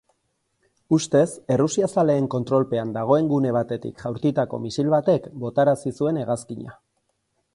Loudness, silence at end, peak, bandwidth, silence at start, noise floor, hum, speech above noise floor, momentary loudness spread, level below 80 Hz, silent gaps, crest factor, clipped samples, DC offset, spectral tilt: -22 LUFS; 0.8 s; -4 dBFS; 11.5 kHz; 0.9 s; -72 dBFS; none; 51 dB; 9 LU; -60 dBFS; none; 18 dB; under 0.1%; under 0.1%; -6.5 dB/octave